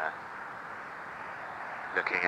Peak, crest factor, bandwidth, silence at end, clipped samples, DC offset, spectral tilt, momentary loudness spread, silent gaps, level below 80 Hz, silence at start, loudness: -10 dBFS; 26 dB; 16 kHz; 0 s; under 0.1%; under 0.1%; -4 dB/octave; 9 LU; none; -74 dBFS; 0 s; -37 LUFS